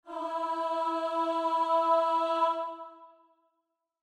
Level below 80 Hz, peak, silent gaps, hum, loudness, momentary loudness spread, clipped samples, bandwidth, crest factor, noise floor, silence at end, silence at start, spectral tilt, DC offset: -84 dBFS; -14 dBFS; none; none; -29 LUFS; 11 LU; under 0.1%; 11 kHz; 16 dB; -82 dBFS; 0.95 s; 0.05 s; -2.5 dB/octave; under 0.1%